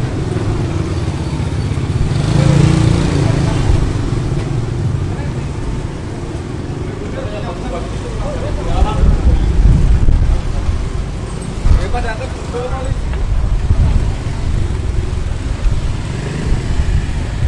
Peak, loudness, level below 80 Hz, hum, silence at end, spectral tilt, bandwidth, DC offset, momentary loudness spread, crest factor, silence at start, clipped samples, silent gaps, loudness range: 0 dBFS; -17 LUFS; -18 dBFS; none; 0 s; -7 dB/octave; 11 kHz; under 0.1%; 10 LU; 14 dB; 0 s; under 0.1%; none; 7 LU